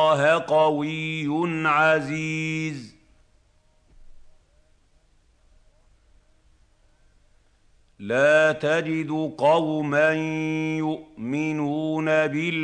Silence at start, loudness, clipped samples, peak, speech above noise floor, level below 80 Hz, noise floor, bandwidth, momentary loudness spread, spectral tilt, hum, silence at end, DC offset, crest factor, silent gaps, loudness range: 0 s; -23 LUFS; under 0.1%; -8 dBFS; 38 dB; -60 dBFS; -61 dBFS; 9.6 kHz; 9 LU; -6 dB/octave; none; 0 s; under 0.1%; 18 dB; none; 11 LU